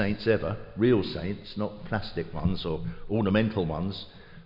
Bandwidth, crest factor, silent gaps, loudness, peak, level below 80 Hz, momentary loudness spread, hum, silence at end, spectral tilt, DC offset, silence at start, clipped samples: 5.6 kHz; 16 dB; none; -29 LUFS; -12 dBFS; -46 dBFS; 10 LU; none; 0 s; -9.5 dB/octave; under 0.1%; 0 s; under 0.1%